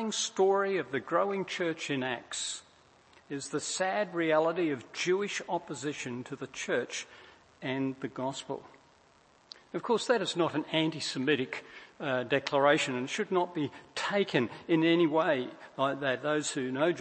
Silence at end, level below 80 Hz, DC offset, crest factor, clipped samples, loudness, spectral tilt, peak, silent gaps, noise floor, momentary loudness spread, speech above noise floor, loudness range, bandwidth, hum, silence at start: 0 s; -76 dBFS; under 0.1%; 20 dB; under 0.1%; -31 LUFS; -4 dB/octave; -10 dBFS; none; -63 dBFS; 13 LU; 32 dB; 7 LU; 8.8 kHz; none; 0 s